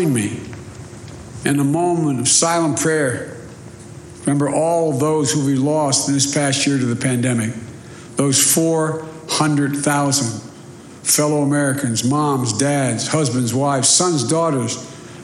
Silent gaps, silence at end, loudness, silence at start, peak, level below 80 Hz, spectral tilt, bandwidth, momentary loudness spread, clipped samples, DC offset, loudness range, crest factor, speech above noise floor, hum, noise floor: none; 0 s; -17 LUFS; 0 s; -2 dBFS; -54 dBFS; -4 dB/octave; 15.5 kHz; 21 LU; under 0.1%; under 0.1%; 2 LU; 16 dB; 21 dB; none; -38 dBFS